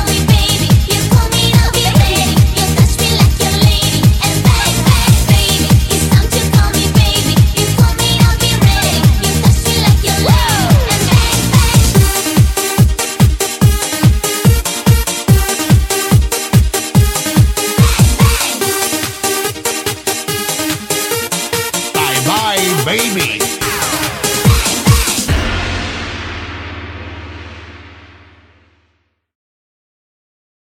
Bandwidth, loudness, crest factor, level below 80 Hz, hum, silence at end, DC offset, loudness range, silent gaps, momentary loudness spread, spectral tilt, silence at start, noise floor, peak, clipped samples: 17.5 kHz; -11 LUFS; 12 dB; -18 dBFS; none; 2.75 s; under 0.1%; 5 LU; none; 6 LU; -4 dB/octave; 0 s; -61 dBFS; 0 dBFS; under 0.1%